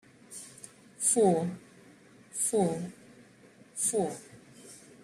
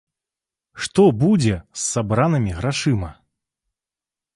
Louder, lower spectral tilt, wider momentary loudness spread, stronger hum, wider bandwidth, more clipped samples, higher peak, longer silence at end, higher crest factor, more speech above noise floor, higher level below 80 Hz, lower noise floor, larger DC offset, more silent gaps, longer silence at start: second, -29 LUFS vs -19 LUFS; about the same, -4.5 dB/octave vs -5.5 dB/octave; first, 25 LU vs 9 LU; neither; first, 15.5 kHz vs 11.5 kHz; neither; second, -12 dBFS vs -4 dBFS; second, 0.25 s vs 1.2 s; about the same, 20 dB vs 18 dB; second, 29 dB vs 71 dB; second, -72 dBFS vs -42 dBFS; second, -57 dBFS vs -89 dBFS; neither; neither; second, 0.3 s vs 0.75 s